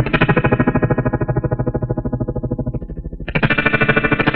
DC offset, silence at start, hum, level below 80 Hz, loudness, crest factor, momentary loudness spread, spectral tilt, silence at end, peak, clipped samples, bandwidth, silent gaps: under 0.1%; 0 s; none; -30 dBFS; -17 LUFS; 16 dB; 10 LU; -11 dB/octave; 0 s; -2 dBFS; under 0.1%; 5.2 kHz; none